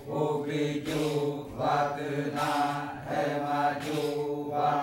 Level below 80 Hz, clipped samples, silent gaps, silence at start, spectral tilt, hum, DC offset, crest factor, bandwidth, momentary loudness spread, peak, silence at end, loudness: -62 dBFS; under 0.1%; none; 0 s; -6 dB/octave; none; under 0.1%; 14 dB; 16 kHz; 4 LU; -14 dBFS; 0 s; -30 LUFS